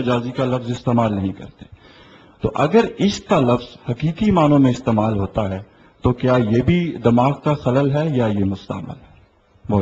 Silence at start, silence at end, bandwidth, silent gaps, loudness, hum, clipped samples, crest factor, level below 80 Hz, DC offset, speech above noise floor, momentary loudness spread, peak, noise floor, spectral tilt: 0 s; 0 s; 8 kHz; none; -18 LUFS; none; under 0.1%; 18 dB; -42 dBFS; under 0.1%; 34 dB; 12 LU; -2 dBFS; -52 dBFS; -7.5 dB/octave